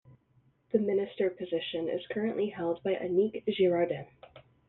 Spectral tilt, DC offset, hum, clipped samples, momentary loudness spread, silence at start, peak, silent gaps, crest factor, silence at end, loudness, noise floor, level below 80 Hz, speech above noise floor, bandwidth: -5 dB/octave; under 0.1%; none; under 0.1%; 7 LU; 0.75 s; -12 dBFS; none; 18 dB; 0.3 s; -31 LUFS; -68 dBFS; -72 dBFS; 38 dB; 4.1 kHz